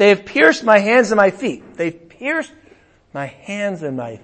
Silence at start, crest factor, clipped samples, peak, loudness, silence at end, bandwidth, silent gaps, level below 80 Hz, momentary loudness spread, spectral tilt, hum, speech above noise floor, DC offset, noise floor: 0 s; 18 dB; under 0.1%; 0 dBFS; -16 LUFS; 0.05 s; 8.8 kHz; none; -58 dBFS; 17 LU; -5 dB/octave; none; 34 dB; under 0.1%; -50 dBFS